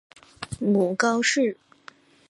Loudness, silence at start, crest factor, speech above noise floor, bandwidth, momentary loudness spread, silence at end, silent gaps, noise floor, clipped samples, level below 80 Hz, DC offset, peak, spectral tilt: -23 LUFS; 0.4 s; 18 dB; 29 dB; 11.5 kHz; 18 LU; 0.75 s; none; -51 dBFS; under 0.1%; -58 dBFS; under 0.1%; -8 dBFS; -4 dB/octave